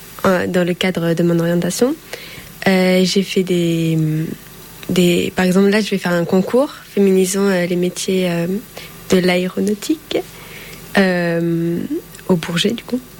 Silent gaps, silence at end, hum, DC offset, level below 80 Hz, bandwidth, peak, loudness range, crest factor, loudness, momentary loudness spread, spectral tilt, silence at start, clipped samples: none; 0 s; none; under 0.1%; -50 dBFS; 17.5 kHz; -2 dBFS; 3 LU; 14 dB; -17 LUFS; 13 LU; -5.5 dB/octave; 0 s; under 0.1%